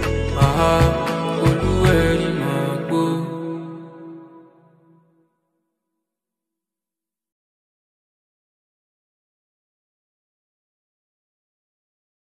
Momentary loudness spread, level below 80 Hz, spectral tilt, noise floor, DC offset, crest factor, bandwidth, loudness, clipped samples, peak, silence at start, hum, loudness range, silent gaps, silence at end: 19 LU; -34 dBFS; -6.5 dB/octave; -89 dBFS; under 0.1%; 22 dB; 14.5 kHz; -19 LUFS; under 0.1%; -2 dBFS; 0 s; none; 17 LU; none; 7.9 s